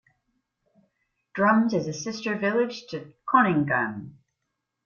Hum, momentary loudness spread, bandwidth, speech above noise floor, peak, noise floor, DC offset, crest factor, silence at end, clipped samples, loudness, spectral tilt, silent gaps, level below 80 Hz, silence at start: none; 16 LU; 7.2 kHz; 57 dB; -6 dBFS; -81 dBFS; under 0.1%; 22 dB; 0.75 s; under 0.1%; -24 LUFS; -6 dB/octave; none; -68 dBFS; 1.35 s